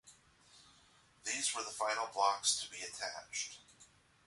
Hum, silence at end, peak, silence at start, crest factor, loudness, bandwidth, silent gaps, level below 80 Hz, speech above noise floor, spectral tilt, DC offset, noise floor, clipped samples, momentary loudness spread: none; 0.4 s; -18 dBFS; 0.05 s; 22 dB; -37 LUFS; 11.5 kHz; none; -78 dBFS; 29 dB; 1 dB/octave; under 0.1%; -67 dBFS; under 0.1%; 12 LU